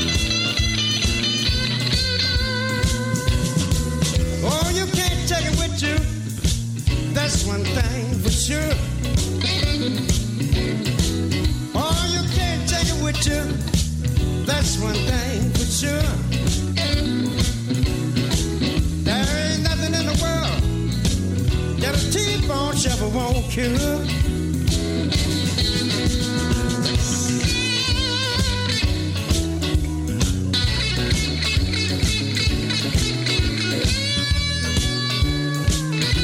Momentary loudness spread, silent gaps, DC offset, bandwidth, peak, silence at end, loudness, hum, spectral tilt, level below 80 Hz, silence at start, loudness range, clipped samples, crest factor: 3 LU; none; under 0.1%; 16.5 kHz; -6 dBFS; 0 s; -21 LUFS; none; -4 dB/octave; -28 dBFS; 0 s; 1 LU; under 0.1%; 16 dB